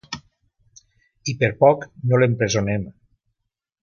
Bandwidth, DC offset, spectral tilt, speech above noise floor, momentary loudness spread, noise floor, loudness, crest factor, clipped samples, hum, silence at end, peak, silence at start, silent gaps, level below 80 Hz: 7.2 kHz; under 0.1%; -5.5 dB/octave; 60 dB; 18 LU; -79 dBFS; -20 LUFS; 20 dB; under 0.1%; none; 0.95 s; -2 dBFS; 0.1 s; none; -50 dBFS